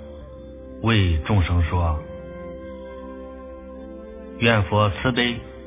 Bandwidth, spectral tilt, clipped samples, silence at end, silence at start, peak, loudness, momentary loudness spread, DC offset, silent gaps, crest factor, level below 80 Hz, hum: 3.9 kHz; -10.5 dB/octave; under 0.1%; 0 s; 0 s; -2 dBFS; -21 LUFS; 19 LU; under 0.1%; none; 22 dB; -32 dBFS; none